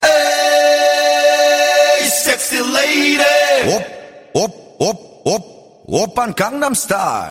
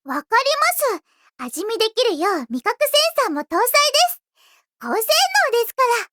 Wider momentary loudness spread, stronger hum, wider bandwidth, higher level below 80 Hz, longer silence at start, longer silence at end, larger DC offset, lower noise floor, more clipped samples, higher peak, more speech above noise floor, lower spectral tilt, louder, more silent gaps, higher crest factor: second, 9 LU vs 12 LU; neither; second, 16.5 kHz vs over 20 kHz; first, -52 dBFS vs -74 dBFS; about the same, 0 s vs 0.05 s; about the same, 0 s vs 0.05 s; neither; second, -34 dBFS vs -58 dBFS; neither; about the same, 0 dBFS vs -2 dBFS; second, 18 dB vs 39 dB; first, -2 dB/octave vs 0.5 dB/octave; first, -14 LUFS vs -18 LUFS; neither; about the same, 14 dB vs 18 dB